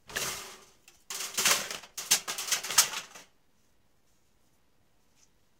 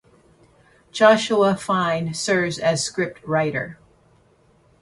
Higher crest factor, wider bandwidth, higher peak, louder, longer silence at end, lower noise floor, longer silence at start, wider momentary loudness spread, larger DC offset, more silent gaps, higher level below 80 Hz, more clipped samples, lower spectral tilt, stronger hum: first, 28 dB vs 20 dB; first, 18 kHz vs 11.5 kHz; second, -6 dBFS vs -2 dBFS; second, -28 LUFS vs -20 LUFS; first, 2.35 s vs 1.05 s; first, -71 dBFS vs -57 dBFS; second, 0.1 s vs 0.95 s; first, 16 LU vs 11 LU; neither; neither; second, -68 dBFS vs -58 dBFS; neither; second, 1.5 dB/octave vs -4.5 dB/octave; neither